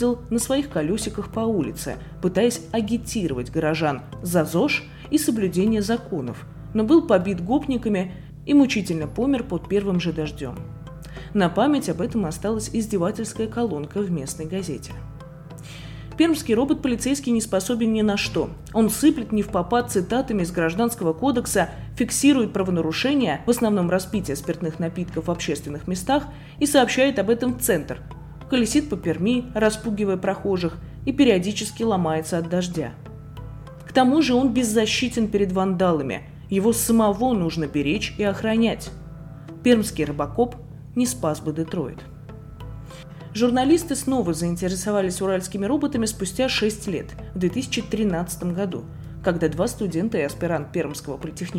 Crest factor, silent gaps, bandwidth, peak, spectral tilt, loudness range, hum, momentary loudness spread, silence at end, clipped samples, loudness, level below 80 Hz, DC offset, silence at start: 18 dB; none; 17 kHz; -6 dBFS; -5 dB/octave; 4 LU; none; 15 LU; 0 s; under 0.1%; -23 LUFS; -44 dBFS; under 0.1%; 0 s